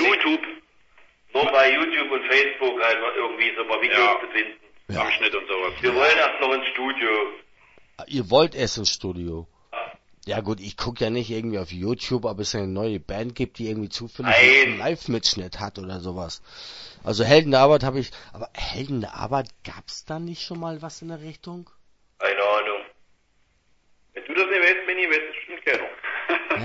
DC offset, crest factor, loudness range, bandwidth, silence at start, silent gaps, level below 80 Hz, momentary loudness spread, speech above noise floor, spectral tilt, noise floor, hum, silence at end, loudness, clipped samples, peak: under 0.1%; 22 dB; 9 LU; 8 kHz; 0 s; none; -50 dBFS; 19 LU; 41 dB; -4 dB/octave; -64 dBFS; none; 0 s; -22 LUFS; under 0.1%; -2 dBFS